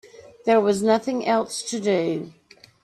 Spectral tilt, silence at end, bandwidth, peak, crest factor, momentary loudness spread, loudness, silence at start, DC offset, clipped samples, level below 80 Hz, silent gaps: -4.5 dB/octave; 0.5 s; 13.5 kHz; -6 dBFS; 16 dB; 10 LU; -22 LUFS; 0.2 s; under 0.1%; under 0.1%; -66 dBFS; none